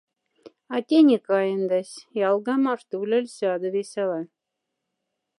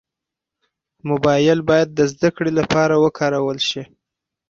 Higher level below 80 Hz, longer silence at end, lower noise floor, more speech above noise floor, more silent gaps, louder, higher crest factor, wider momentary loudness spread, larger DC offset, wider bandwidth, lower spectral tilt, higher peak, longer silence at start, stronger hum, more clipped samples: second, -84 dBFS vs -52 dBFS; first, 1.1 s vs 0.65 s; about the same, -82 dBFS vs -85 dBFS; second, 59 dB vs 68 dB; neither; second, -24 LUFS vs -17 LUFS; about the same, 18 dB vs 16 dB; first, 13 LU vs 7 LU; neither; first, 11.5 kHz vs 7.8 kHz; about the same, -6 dB/octave vs -5.5 dB/octave; second, -6 dBFS vs -2 dBFS; second, 0.45 s vs 1.05 s; neither; neither